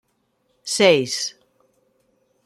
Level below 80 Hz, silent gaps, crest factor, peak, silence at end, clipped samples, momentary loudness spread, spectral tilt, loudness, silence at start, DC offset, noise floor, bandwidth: -70 dBFS; none; 20 dB; -2 dBFS; 1.15 s; under 0.1%; 14 LU; -3 dB/octave; -19 LUFS; 0.65 s; under 0.1%; -68 dBFS; 15.5 kHz